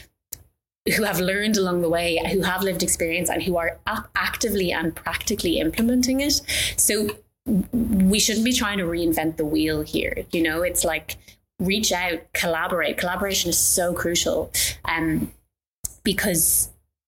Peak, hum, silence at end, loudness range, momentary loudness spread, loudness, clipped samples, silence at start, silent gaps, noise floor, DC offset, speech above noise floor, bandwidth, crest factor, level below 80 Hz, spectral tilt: -6 dBFS; none; 0.35 s; 3 LU; 9 LU; -22 LUFS; under 0.1%; 0.3 s; 0.81-0.85 s, 15.71-15.84 s; -57 dBFS; under 0.1%; 34 dB; 17 kHz; 16 dB; -42 dBFS; -3 dB/octave